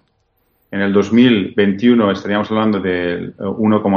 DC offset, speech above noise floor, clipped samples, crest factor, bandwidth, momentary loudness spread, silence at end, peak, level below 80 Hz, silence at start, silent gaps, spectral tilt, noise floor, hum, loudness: under 0.1%; 48 dB; under 0.1%; 14 dB; 7 kHz; 10 LU; 0 s; 0 dBFS; -56 dBFS; 0.7 s; none; -7.5 dB/octave; -63 dBFS; none; -15 LUFS